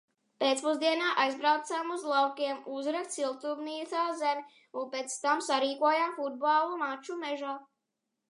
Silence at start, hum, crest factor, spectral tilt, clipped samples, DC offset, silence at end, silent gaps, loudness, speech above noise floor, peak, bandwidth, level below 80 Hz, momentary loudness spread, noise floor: 0.4 s; none; 18 dB; -1 dB/octave; under 0.1%; under 0.1%; 0.65 s; none; -31 LUFS; 54 dB; -14 dBFS; 11.5 kHz; under -90 dBFS; 10 LU; -85 dBFS